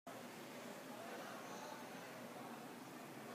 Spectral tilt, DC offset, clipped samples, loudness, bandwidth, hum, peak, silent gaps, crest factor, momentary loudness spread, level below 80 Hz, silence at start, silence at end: -3.5 dB/octave; under 0.1%; under 0.1%; -52 LUFS; 15.5 kHz; none; -38 dBFS; none; 14 dB; 3 LU; under -90 dBFS; 0.05 s; 0 s